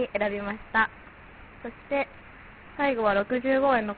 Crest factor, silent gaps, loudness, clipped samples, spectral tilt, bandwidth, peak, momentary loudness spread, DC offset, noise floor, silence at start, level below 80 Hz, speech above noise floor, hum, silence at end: 18 dB; none; -26 LUFS; under 0.1%; -3 dB/octave; 4.7 kHz; -10 dBFS; 24 LU; under 0.1%; -48 dBFS; 0 s; -54 dBFS; 22 dB; none; 0 s